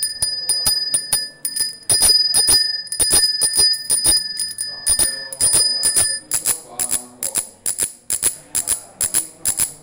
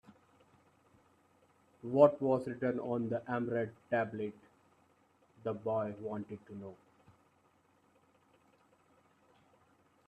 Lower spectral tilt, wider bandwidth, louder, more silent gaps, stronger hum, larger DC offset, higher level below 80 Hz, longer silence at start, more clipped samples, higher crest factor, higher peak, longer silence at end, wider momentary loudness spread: second, 1 dB/octave vs -9 dB/octave; first, 17.5 kHz vs 9 kHz; first, -16 LUFS vs -35 LUFS; neither; neither; neither; first, -44 dBFS vs -78 dBFS; about the same, 0 s vs 0.1 s; neither; second, 16 dB vs 26 dB; first, -2 dBFS vs -12 dBFS; second, 0.05 s vs 3.35 s; second, 9 LU vs 20 LU